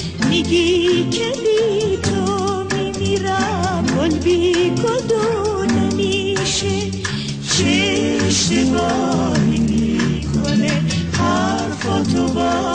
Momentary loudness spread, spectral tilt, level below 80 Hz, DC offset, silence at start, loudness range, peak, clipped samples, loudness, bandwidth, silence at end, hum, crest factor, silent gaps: 5 LU; -4.5 dB/octave; -38 dBFS; under 0.1%; 0 s; 1 LU; -4 dBFS; under 0.1%; -17 LUFS; 10 kHz; 0 s; none; 14 dB; none